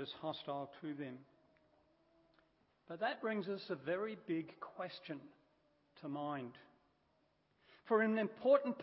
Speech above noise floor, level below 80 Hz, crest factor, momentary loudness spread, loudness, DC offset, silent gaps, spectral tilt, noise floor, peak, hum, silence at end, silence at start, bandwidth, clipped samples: 38 dB; -88 dBFS; 24 dB; 17 LU; -40 LUFS; under 0.1%; none; -4 dB/octave; -78 dBFS; -18 dBFS; none; 0 s; 0 s; 5.6 kHz; under 0.1%